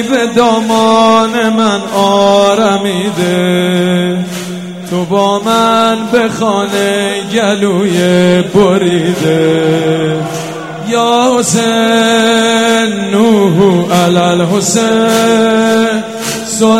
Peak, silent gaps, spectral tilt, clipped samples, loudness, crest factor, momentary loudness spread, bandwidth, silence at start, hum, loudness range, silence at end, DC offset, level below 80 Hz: 0 dBFS; none; -4.5 dB/octave; 0.4%; -10 LUFS; 10 dB; 7 LU; 16 kHz; 0 s; none; 3 LU; 0 s; 0.4%; -50 dBFS